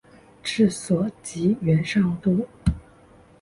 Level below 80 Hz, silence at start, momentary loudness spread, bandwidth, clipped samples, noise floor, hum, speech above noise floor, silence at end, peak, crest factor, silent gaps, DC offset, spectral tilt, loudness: -40 dBFS; 0.45 s; 8 LU; 11.5 kHz; under 0.1%; -52 dBFS; none; 30 dB; 0.6 s; -8 dBFS; 16 dB; none; under 0.1%; -6.5 dB/octave; -23 LUFS